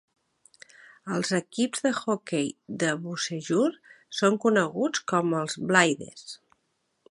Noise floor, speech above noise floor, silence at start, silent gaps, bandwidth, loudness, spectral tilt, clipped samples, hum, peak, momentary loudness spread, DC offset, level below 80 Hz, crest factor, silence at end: -75 dBFS; 49 dB; 1.05 s; none; 11.5 kHz; -26 LUFS; -4 dB/octave; under 0.1%; none; -4 dBFS; 13 LU; under 0.1%; -74 dBFS; 24 dB; 0.75 s